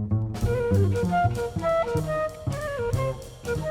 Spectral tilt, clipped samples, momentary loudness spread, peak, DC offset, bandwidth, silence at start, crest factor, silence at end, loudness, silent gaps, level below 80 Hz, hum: -7 dB/octave; under 0.1%; 8 LU; -10 dBFS; under 0.1%; 15.5 kHz; 0 s; 14 dB; 0 s; -26 LUFS; none; -40 dBFS; none